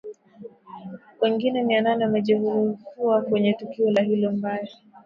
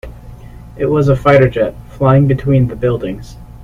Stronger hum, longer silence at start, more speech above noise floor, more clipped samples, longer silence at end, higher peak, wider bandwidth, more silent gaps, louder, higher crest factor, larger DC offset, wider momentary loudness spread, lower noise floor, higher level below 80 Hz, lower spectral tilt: neither; about the same, 0.05 s vs 0.05 s; about the same, 23 dB vs 20 dB; neither; about the same, 0.1 s vs 0 s; second, -8 dBFS vs 0 dBFS; about the same, 7 kHz vs 7.2 kHz; neither; second, -23 LUFS vs -13 LUFS; about the same, 16 dB vs 14 dB; neither; first, 20 LU vs 12 LU; first, -45 dBFS vs -33 dBFS; second, -70 dBFS vs -32 dBFS; about the same, -8 dB/octave vs -9 dB/octave